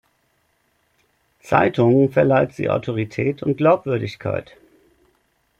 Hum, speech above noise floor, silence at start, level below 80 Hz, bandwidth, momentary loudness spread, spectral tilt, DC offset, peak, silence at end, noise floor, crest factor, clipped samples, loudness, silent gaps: none; 47 dB; 1.45 s; -56 dBFS; 12 kHz; 10 LU; -8.5 dB/octave; under 0.1%; -2 dBFS; 1.15 s; -66 dBFS; 18 dB; under 0.1%; -19 LUFS; none